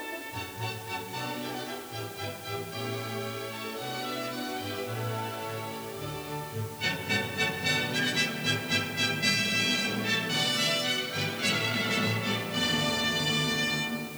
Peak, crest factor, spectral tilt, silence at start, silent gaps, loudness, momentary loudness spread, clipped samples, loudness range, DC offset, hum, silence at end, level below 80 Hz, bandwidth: -12 dBFS; 20 dB; -3 dB/octave; 0 s; none; -29 LUFS; 11 LU; under 0.1%; 9 LU; under 0.1%; none; 0 s; -62 dBFS; over 20 kHz